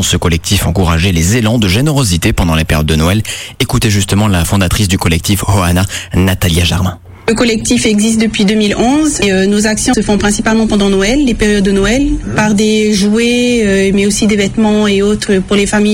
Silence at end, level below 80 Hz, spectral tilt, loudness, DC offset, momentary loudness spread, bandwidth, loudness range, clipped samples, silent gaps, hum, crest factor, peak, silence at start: 0 s; -24 dBFS; -4.5 dB/octave; -11 LUFS; under 0.1%; 3 LU; 16.5 kHz; 1 LU; under 0.1%; none; none; 10 dB; 0 dBFS; 0 s